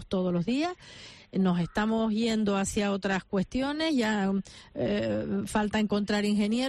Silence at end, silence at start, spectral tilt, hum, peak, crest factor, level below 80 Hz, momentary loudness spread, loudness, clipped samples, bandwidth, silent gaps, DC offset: 0 s; 0 s; -5.5 dB/octave; none; -16 dBFS; 12 dB; -52 dBFS; 7 LU; -28 LUFS; under 0.1%; 13 kHz; none; under 0.1%